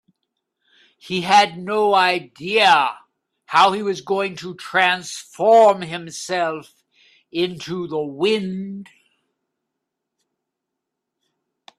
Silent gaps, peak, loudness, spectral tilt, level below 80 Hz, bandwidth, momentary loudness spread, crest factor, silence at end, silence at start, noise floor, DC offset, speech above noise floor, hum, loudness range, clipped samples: none; 0 dBFS; -18 LUFS; -3.5 dB/octave; -68 dBFS; 13.5 kHz; 15 LU; 20 dB; 2.95 s; 1.05 s; -81 dBFS; under 0.1%; 63 dB; none; 10 LU; under 0.1%